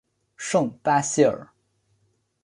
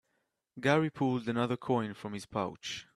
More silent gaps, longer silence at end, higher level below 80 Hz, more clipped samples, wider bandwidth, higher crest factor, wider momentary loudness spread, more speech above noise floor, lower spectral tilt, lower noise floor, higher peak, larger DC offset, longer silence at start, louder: neither; first, 1 s vs 0.1 s; about the same, -66 dBFS vs -70 dBFS; neither; second, 11.5 kHz vs 13 kHz; about the same, 20 dB vs 22 dB; first, 13 LU vs 10 LU; about the same, 47 dB vs 48 dB; second, -4.5 dB/octave vs -6 dB/octave; second, -69 dBFS vs -80 dBFS; first, -6 dBFS vs -12 dBFS; neither; second, 0.4 s vs 0.55 s; first, -22 LUFS vs -33 LUFS